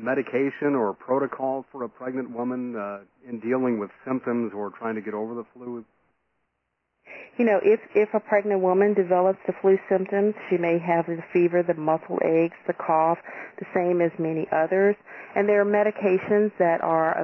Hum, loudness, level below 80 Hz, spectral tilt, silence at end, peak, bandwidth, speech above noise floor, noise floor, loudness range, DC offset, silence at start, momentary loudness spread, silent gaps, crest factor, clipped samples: none; -24 LUFS; -74 dBFS; -10 dB/octave; 0 s; -8 dBFS; 5.6 kHz; 54 dB; -78 dBFS; 7 LU; under 0.1%; 0 s; 12 LU; none; 16 dB; under 0.1%